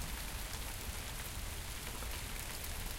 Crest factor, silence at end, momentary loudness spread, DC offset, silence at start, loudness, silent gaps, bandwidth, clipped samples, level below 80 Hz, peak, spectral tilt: 20 dB; 0 s; 1 LU; under 0.1%; 0 s; -43 LUFS; none; 17 kHz; under 0.1%; -46 dBFS; -22 dBFS; -2.5 dB/octave